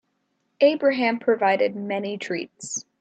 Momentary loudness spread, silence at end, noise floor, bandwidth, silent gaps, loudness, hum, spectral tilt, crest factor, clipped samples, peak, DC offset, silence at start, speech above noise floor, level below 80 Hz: 11 LU; 0.2 s; -73 dBFS; 9 kHz; none; -23 LUFS; none; -3.5 dB/octave; 18 dB; under 0.1%; -6 dBFS; under 0.1%; 0.6 s; 50 dB; -76 dBFS